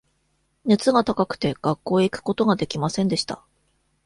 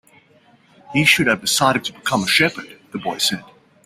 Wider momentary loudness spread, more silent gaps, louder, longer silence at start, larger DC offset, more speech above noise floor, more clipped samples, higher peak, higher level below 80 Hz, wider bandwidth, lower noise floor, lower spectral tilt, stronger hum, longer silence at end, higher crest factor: second, 7 LU vs 15 LU; neither; second, -22 LUFS vs -17 LUFS; second, 0.65 s vs 0.9 s; neither; first, 47 dB vs 35 dB; neither; second, -4 dBFS vs 0 dBFS; about the same, -56 dBFS vs -56 dBFS; second, 11.5 kHz vs 16 kHz; first, -69 dBFS vs -54 dBFS; first, -5.5 dB/octave vs -3 dB/octave; neither; first, 0.7 s vs 0.4 s; about the same, 18 dB vs 20 dB